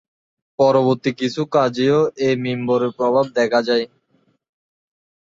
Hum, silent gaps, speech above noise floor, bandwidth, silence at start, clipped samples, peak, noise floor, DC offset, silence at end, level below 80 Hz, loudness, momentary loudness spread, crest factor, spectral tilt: none; none; 45 dB; 7.8 kHz; 0.6 s; under 0.1%; -4 dBFS; -63 dBFS; under 0.1%; 1.45 s; -62 dBFS; -18 LUFS; 6 LU; 16 dB; -6 dB/octave